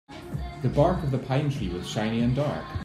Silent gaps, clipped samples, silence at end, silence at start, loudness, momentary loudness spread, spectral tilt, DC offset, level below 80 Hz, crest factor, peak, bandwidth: none; under 0.1%; 0 s; 0.1 s; -27 LUFS; 11 LU; -7 dB/octave; under 0.1%; -42 dBFS; 20 dB; -8 dBFS; 12 kHz